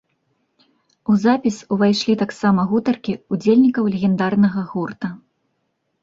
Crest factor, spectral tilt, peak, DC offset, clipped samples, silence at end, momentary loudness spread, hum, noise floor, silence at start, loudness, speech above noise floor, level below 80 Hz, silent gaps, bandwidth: 16 dB; -7 dB/octave; -4 dBFS; under 0.1%; under 0.1%; 0.85 s; 11 LU; none; -71 dBFS; 1.1 s; -18 LUFS; 53 dB; -58 dBFS; none; 7.8 kHz